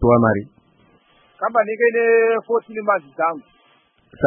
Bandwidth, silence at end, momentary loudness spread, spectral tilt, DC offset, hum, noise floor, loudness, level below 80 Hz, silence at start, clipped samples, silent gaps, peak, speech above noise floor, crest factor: 3.4 kHz; 0 s; 9 LU; -12.5 dB/octave; under 0.1%; none; -58 dBFS; -19 LUFS; -44 dBFS; 0 s; under 0.1%; none; -4 dBFS; 40 dB; 16 dB